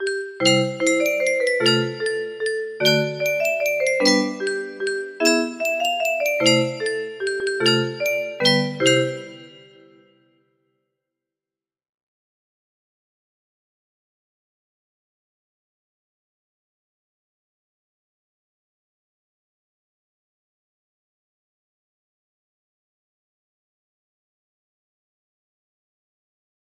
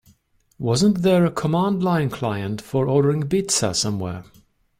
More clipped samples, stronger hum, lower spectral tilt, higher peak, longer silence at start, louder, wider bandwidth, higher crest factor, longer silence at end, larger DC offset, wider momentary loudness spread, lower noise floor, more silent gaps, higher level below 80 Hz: neither; neither; second, -3.5 dB/octave vs -5.5 dB/octave; first, -2 dBFS vs -6 dBFS; second, 0 s vs 0.6 s; about the same, -20 LUFS vs -21 LUFS; about the same, 15.5 kHz vs 16 kHz; first, 24 dB vs 14 dB; first, 17.05 s vs 0.6 s; neither; about the same, 9 LU vs 10 LU; first, under -90 dBFS vs -59 dBFS; neither; second, -72 dBFS vs -52 dBFS